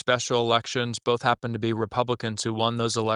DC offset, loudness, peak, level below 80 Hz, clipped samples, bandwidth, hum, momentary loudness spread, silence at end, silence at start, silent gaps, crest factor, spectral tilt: under 0.1%; -25 LUFS; -6 dBFS; -62 dBFS; under 0.1%; 11 kHz; none; 5 LU; 0 s; 0.05 s; none; 18 dB; -4.5 dB/octave